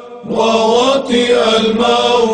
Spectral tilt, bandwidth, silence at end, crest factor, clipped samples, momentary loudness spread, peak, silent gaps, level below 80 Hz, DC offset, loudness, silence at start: -4 dB/octave; 10 kHz; 0 s; 12 dB; under 0.1%; 3 LU; 0 dBFS; none; -48 dBFS; under 0.1%; -12 LUFS; 0 s